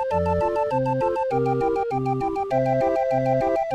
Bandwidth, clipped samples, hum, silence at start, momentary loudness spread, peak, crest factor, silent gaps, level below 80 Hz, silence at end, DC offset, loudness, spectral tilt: 9.8 kHz; under 0.1%; none; 0 s; 3 LU; -10 dBFS; 12 dB; none; -46 dBFS; 0 s; under 0.1%; -23 LUFS; -8.5 dB/octave